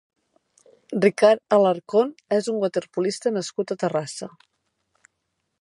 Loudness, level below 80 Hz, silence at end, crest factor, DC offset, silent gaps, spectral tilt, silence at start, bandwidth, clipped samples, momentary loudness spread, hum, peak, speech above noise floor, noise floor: -22 LUFS; -76 dBFS; 1.3 s; 20 dB; under 0.1%; none; -5 dB/octave; 0.9 s; 11.5 kHz; under 0.1%; 12 LU; none; -4 dBFS; 55 dB; -77 dBFS